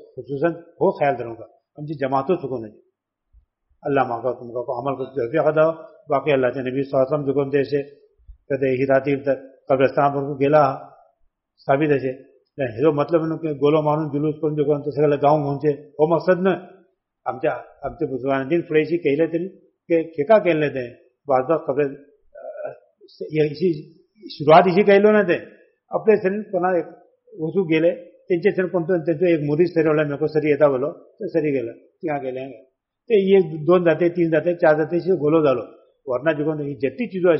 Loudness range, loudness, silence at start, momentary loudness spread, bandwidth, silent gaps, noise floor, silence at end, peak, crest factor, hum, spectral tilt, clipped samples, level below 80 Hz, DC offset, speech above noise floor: 6 LU; -20 LUFS; 0.15 s; 15 LU; 5.8 kHz; none; -65 dBFS; 0 s; -2 dBFS; 18 dB; none; -6 dB/octave; under 0.1%; -60 dBFS; under 0.1%; 45 dB